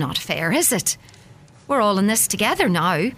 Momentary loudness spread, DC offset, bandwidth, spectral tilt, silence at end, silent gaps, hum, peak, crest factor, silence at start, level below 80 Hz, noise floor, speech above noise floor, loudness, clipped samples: 6 LU; under 0.1%; 16 kHz; -3 dB/octave; 0 s; none; none; -4 dBFS; 16 dB; 0 s; -52 dBFS; -47 dBFS; 27 dB; -19 LUFS; under 0.1%